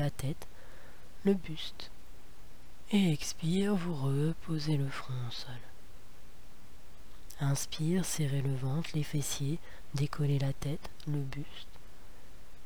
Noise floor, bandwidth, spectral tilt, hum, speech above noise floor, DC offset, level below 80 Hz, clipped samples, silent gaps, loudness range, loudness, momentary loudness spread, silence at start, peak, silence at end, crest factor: -54 dBFS; over 20 kHz; -5.5 dB/octave; none; 21 dB; 1%; -54 dBFS; under 0.1%; none; 5 LU; -34 LUFS; 17 LU; 0 s; -16 dBFS; 0 s; 18 dB